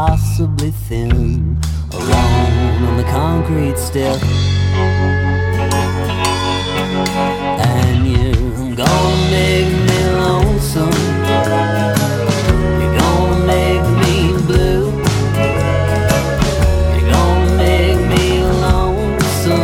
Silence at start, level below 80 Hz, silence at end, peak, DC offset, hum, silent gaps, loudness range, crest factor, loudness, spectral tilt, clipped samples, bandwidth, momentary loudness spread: 0 s; -22 dBFS; 0 s; 0 dBFS; under 0.1%; none; none; 2 LU; 14 dB; -14 LUFS; -6 dB/octave; under 0.1%; 16.5 kHz; 4 LU